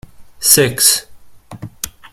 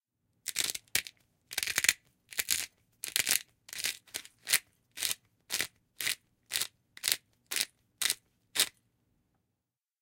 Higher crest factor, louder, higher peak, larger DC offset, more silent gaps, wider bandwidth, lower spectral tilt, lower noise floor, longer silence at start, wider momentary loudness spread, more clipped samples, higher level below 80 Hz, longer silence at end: second, 18 dB vs 34 dB; first, -11 LUFS vs -33 LUFS; about the same, 0 dBFS vs -2 dBFS; neither; neither; first, over 20 kHz vs 17 kHz; first, -1.5 dB/octave vs 2 dB/octave; second, -36 dBFS vs -88 dBFS; second, 0.2 s vs 0.45 s; first, 23 LU vs 13 LU; first, 0.1% vs under 0.1%; first, -48 dBFS vs -72 dBFS; second, 0.05 s vs 1.3 s